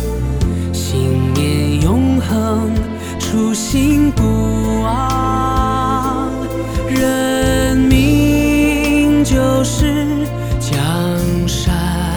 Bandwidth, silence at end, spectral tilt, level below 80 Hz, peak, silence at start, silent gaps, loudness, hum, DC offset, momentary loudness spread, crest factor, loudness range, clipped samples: over 20 kHz; 0 s; -6 dB/octave; -24 dBFS; 0 dBFS; 0 s; none; -15 LUFS; none; 0.3%; 7 LU; 14 dB; 3 LU; under 0.1%